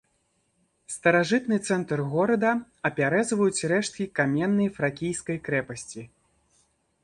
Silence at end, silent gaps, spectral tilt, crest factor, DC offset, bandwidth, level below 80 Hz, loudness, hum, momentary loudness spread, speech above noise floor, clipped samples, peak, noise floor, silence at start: 1 s; none; -5 dB/octave; 18 dB; under 0.1%; 11.5 kHz; -64 dBFS; -25 LUFS; none; 8 LU; 46 dB; under 0.1%; -8 dBFS; -71 dBFS; 0.9 s